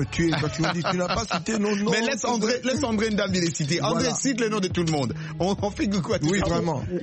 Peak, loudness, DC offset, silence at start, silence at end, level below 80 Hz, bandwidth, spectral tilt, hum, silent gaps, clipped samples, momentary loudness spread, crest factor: -8 dBFS; -24 LUFS; under 0.1%; 0 s; 0 s; -46 dBFS; 8.8 kHz; -4.5 dB/octave; none; none; under 0.1%; 3 LU; 16 dB